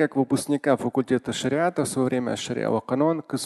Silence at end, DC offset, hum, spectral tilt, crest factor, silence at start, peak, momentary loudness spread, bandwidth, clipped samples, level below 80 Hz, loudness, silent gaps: 0 s; under 0.1%; none; -5.5 dB/octave; 18 dB; 0 s; -6 dBFS; 3 LU; 12.5 kHz; under 0.1%; -62 dBFS; -24 LUFS; none